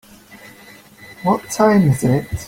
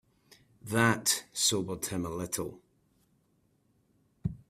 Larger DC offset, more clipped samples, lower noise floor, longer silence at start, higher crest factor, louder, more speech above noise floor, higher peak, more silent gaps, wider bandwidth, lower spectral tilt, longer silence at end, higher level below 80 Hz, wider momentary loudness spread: neither; neither; second, -43 dBFS vs -71 dBFS; second, 0.35 s vs 0.65 s; second, 16 dB vs 24 dB; first, -16 LUFS vs -30 LUFS; second, 28 dB vs 41 dB; first, -2 dBFS vs -10 dBFS; neither; about the same, 16.5 kHz vs 16 kHz; first, -6.5 dB/octave vs -3 dB/octave; second, 0 s vs 0.15 s; first, -44 dBFS vs -60 dBFS; second, 7 LU vs 14 LU